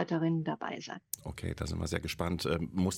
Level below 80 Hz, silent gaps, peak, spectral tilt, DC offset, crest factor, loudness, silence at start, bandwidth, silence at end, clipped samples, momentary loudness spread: -50 dBFS; none; -12 dBFS; -5.5 dB/octave; under 0.1%; 22 dB; -35 LUFS; 0 s; 16.5 kHz; 0 s; under 0.1%; 9 LU